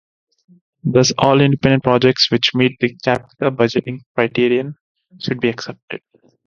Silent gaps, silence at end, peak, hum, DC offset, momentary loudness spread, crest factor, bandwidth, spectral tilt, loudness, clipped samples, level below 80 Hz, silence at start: 4.06-4.15 s, 4.81-4.95 s, 5.82-5.88 s; 0.5 s; 0 dBFS; none; under 0.1%; 15 LU; 18 dB; 7.4 kHz; -5 dB/octave; -16 LUFS; under 0.1%; -50 dBFS; 0.85 s